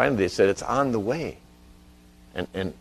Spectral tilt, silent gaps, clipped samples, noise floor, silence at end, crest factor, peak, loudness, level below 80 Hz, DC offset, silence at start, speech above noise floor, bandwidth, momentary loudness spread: -5.5 dB/octave; none; under 0.1%; -52 dBFS; 0.05 s; 22 dB; -4 dBFS; -25 LUFS; -52 dBFS; under 0.1%; 0 s; 27 dB; 13.5 kHz; 13 LU